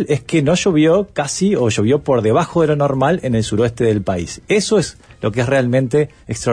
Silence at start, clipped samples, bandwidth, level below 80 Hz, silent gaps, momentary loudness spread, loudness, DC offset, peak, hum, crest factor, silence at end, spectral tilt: 0 s; under 0.1%; 10.5 kHz; -44 dBFS; none; 7 LU; -16 LUFS; under 0.1%; -4 dBFS; none; 12 dB; 0 s; -5.5 dB/octave